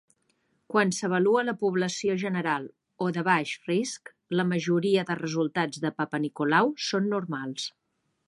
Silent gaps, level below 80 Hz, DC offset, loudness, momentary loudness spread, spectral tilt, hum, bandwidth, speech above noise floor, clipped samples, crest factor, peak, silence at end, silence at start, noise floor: none; -76 dBFS; under 0.1%; -27 LUFS; 9 LU; -5 dB/octave; none; 11.5 kHz; 45 dB; under 0.1%; 20 dB; -8 dBFS; 0.6 s; 0.7 s; -72 dBFS